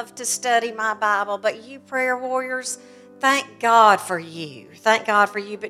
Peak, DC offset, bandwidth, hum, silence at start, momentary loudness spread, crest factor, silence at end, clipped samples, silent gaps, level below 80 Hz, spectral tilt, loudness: -2 dBFS; under 0.1%; 15.5 kHz; none; 0 s; 15 LU; 20 dB; 0 s; under 0.1%; none; -78 dBFS; -2 dB/octave; -20 LUFS